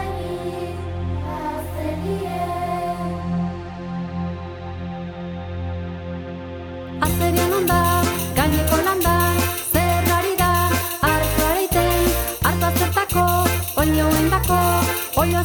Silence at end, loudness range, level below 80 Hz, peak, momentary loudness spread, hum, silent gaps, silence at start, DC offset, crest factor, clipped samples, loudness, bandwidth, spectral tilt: 0 s; 10 LU; -32 dBFS; -2 dBFS; 13 LU; none; none; 0 s; under 0.1%; 18 dB; under 0.1%; -20 LUFS; 18 kHz; -5 dB/octave